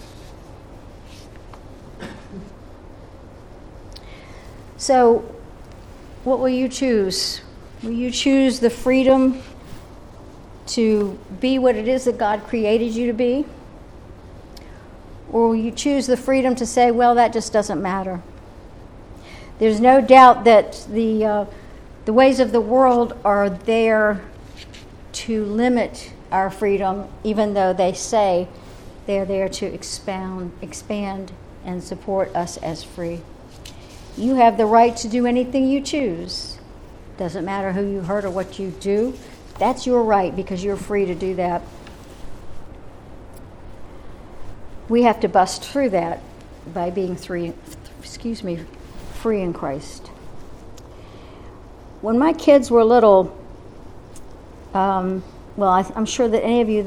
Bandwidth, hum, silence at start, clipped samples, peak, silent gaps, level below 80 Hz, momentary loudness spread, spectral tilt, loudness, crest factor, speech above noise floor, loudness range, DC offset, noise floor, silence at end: 14 kHz; none; 0 s; under 0.1%; 0 dBFS; none; -44 dBFS; 23 LU; -5 dB/octave; -19 LUFS; 20 dB; 22 dB; 12 LU; under 0.1%; -40 dBFS; 0 s